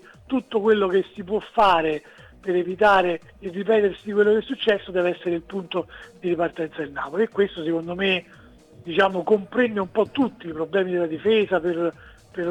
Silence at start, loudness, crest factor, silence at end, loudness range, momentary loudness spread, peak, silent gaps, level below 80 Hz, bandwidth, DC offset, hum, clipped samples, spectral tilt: 0.3 s; -23 LUFS; 16 dB; 0 s; 4 LU; 11 LU; -6 dBFS; none; -56 dBFS; 9.4 kHz; under 0.1%; none; under 0.1%; -6.5 dB/octave